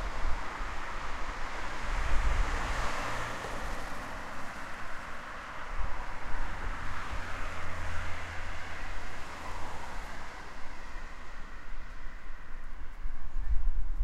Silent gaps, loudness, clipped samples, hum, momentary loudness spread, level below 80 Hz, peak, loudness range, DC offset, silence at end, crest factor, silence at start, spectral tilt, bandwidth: none; -39 LUFS; under 0.1%; none; 13 LU; -36 dBFS; -12 dBFS; 9 LU; under 0.1%; 0 s; 16 dB; 0 s; -4 dB/octave; 9.8 kHz